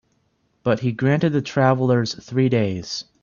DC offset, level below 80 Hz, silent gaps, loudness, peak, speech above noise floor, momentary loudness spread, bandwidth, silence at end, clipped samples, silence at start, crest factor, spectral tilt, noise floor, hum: under 0.1%; -58 dBFS; none; -21 LUFS; -2 dBFS; 46 dB; 8 LU; 7.2 kHz; 0.2 s; under 0.1%; 0.65 s; 18 dB; -6.5 dB/octave; -66 dBFS; none